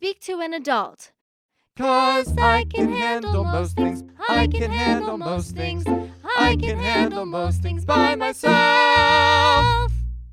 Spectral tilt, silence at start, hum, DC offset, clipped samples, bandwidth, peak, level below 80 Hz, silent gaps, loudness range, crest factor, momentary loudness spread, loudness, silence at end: -5 dB/octave; 0 s; none; under 0.1%; under 0.1%; 14 kHz; -2 dBFS; -32 dBFS; 1.21-1.49 s; 5 LU; 18 dB; 12 LU; -20 LUFS; 0 s